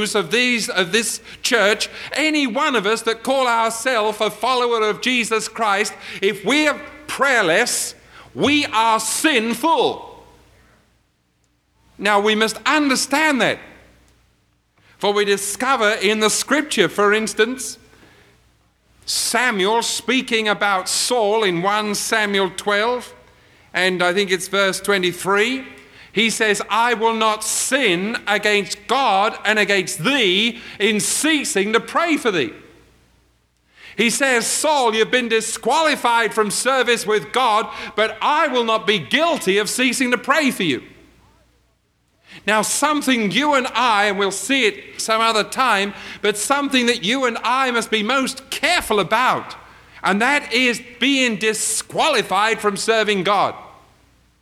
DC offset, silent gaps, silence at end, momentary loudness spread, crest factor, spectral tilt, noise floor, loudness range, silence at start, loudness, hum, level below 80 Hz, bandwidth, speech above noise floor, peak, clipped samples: under 0.1%; none; 0.7 s; 5 LU; 18 dB; -2.5 dB/octave; -64 dBFS; 3 LU; 0 s; -18 LUFS; none; -58 dBFS; 16.5 kHz; 45 dB; -2 dBFS; under 0.1%